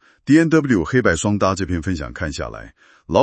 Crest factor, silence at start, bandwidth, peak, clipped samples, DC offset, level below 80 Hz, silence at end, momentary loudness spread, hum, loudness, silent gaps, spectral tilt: 18 dB; 0.25 s; 8.8 kHz; 0 dBFS; under 0.1%; under 0.1%; -40 dBFS; 0 s; 13 LU; none; -18 LUFS; none; -6 dB/octave